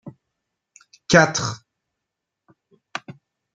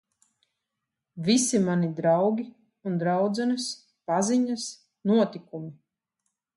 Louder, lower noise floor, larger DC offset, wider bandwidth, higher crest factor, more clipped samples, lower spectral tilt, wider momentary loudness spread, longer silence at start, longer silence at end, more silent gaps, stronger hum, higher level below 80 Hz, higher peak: first, -18 LUFS vs -26 LUFS; about the same, -83 dBFS vs -85 dBFS; neither; second, 9.2 kHz vs 11.5 kHz; first, 24 dB vs 16 dB; neither; about the same, -4 dB/octave vs -5 dB/octave; first, 23 LU vs 16 LU; second, 0.05 s vs 1.15 s; second, 0.45 s vs 0.85 s; neither; neither; first, -56 dBFS vs -74 dBFS; first, -2 dBFS vs -10 dBFS